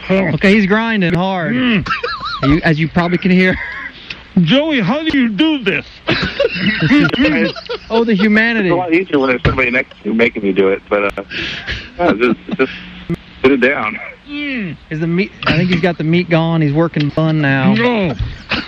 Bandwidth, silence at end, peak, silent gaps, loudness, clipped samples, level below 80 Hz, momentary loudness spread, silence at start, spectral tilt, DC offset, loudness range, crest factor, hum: 7.8 kHz; 0 s; 0 dBFS; none; -14 LUFS; under 0.1%; -36 dBFS; 10 LU; 0 s; -7.5 dB/octave; under 0.1%; 3 LU; 14 dB; none